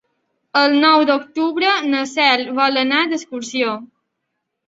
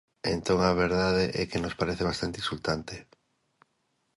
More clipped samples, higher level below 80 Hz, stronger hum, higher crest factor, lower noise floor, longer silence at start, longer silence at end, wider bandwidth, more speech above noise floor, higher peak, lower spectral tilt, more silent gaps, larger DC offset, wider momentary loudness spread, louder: neither; second, -68 dBFS vs -48 dBFS; neither; about the same, 18 dB vs 18 dB; about the same, -76 dBFS vs -75 dBFS; first, 0.55 s vs 0.25 s; second, 0.85 s vs 1.15 s; second, 8 kHz vs 11.5 kHz; first, 59 dB vs 47 dB; first, 0 dBFS vs -10 dBFS; second, -2.5 dB/octave vs -5.5 dB/octave; neither; neither; about the same, 9 LU vs 7 LU; first, -16 LUFS vs -28 LUFS